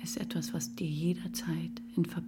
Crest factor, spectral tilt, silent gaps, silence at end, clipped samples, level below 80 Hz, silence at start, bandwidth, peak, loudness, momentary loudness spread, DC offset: 16 dB; -5.5 dB/octave; none; 0 s; under 0.1%; -64 dBFS; 0 s; 18.5 kHz; -20 dBFS; -35 LUFS; 3 LU; under 0.1%